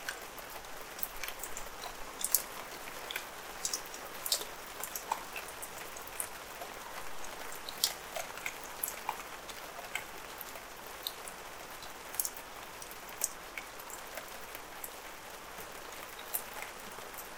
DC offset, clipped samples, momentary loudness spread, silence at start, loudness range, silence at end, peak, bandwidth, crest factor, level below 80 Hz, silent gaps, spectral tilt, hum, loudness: under 0.1%; under 0.1%; 11 LU; 0 s; 6 LU; 0 s; -2 dBFS; 18 kHz; 40 dB; -62 dBFS; none; 0 dB/octave; none; -40 LUFS